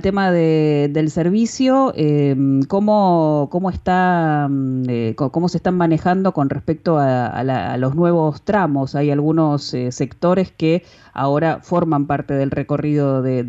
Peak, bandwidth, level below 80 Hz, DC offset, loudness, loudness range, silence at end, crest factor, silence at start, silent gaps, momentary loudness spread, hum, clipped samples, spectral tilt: -6 dBFS; 8 kHz; -46 dBFS; under 0.1%; -17 LUFS; 3 LU; 0 s; 12 dB; 0 s; none; 5 LU; none; under 0.1%; -7.5 dB/octave